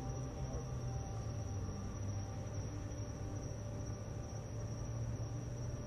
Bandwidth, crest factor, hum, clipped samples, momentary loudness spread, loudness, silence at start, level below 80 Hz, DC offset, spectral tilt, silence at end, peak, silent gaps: 11.5 kHz; 12 dB; none; under 0.1%; 2 LU; -44 LUFS; 0 s; -50 dBFS; under 0.1%; -6.5 dB/octave; 0 s; -30 dBFS; none